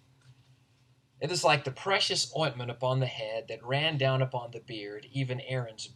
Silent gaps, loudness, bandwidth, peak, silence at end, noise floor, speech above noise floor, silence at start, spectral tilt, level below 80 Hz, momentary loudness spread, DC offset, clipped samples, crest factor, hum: none; -30 LUFS; 12 kHz; -10 dBFS; 0.05 s; -66 dBFS; 35 dB; 0.3 s; -4 dB/octave; -72 dBFS; 13 LU; under 0.1%; under 0.1%; 20 dB; none